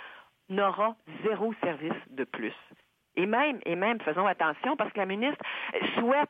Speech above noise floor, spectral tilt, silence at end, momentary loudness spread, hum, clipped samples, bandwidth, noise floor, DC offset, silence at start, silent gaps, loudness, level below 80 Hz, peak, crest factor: 21 dB; -7.5 dB/octave; 0.05 s; 10 LU; none; under 0.1%; 5 kHz; -50 dBFS; under 0.1%; 0 s; none; -30 LUFS; -82 dBFS; -14 dBFS; 16 dB